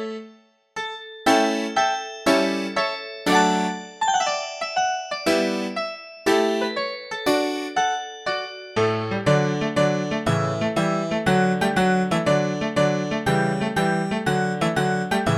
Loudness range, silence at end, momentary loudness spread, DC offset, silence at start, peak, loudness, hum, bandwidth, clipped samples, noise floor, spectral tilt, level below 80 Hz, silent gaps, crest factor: 2 LU; 0 s; 8 LU; under 0.1%; 0 s; -4 dBFS; -22 LUFS; none; 15.5 kHz; under 0.1%; -51 dBFS; -5 dB/octave; -54 dBFS; none; 18 dB